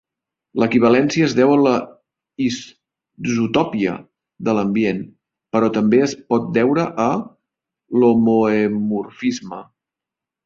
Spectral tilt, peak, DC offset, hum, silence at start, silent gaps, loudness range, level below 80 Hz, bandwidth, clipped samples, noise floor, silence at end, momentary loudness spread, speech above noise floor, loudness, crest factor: -6 dB/octave; -2 dBFS; under 0.1%; none; 0.55 s; none; 4 LU; -58 dBFS; 7.6 kHz; under 0.1%; -86 dBFS; 0.85 s; 14 LU; 69 dB; -18 LUFS; 16 dB